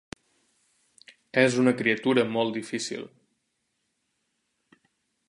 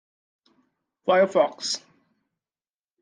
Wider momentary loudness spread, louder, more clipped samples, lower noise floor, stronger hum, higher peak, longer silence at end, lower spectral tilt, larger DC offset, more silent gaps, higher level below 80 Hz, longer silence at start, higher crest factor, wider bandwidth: first, 23 LU vs 12 LU; about the same, -25 LUFS vs -23 LUFS; neither; second, -77 dBFS vs under -90 dBFS; neither; about the same, -6 dBFS vs -8 dBFS; first, 2.2 s vs 1.25 s; first, -5 dB/octave vs -3 dB/octave; neither; neither; first, -70 dBFS vs -84 dBFS; first, 1.35 s vs 1.05 s; about the same, 24 dB vs 20 dB; first, 11.5 kHz vs 10 kHz